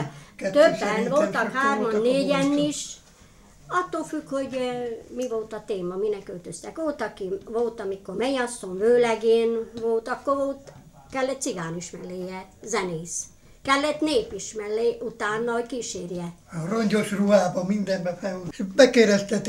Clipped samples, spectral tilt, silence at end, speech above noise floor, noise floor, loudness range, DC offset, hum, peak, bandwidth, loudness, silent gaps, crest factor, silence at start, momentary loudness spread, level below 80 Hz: under 0.1%; -4.5 dB/octave; 0 s; 27 dB; -52 dBFS; 7 LU; under 0.1%; none; -2 dBFS; 15 kHz; -25 LUFS; none; 22 dB; 0 s; 14 LU; -58 dBFS